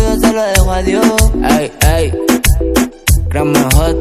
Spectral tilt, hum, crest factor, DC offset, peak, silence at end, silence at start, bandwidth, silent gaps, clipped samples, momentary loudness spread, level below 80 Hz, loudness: -5 dB/octave; none; 10 dB; under 0.1%; 0 dBFS; 0 s; 0 s; 16 kHz; none; 0.4%; 3 LU; -16 dBFS; -12 LUFS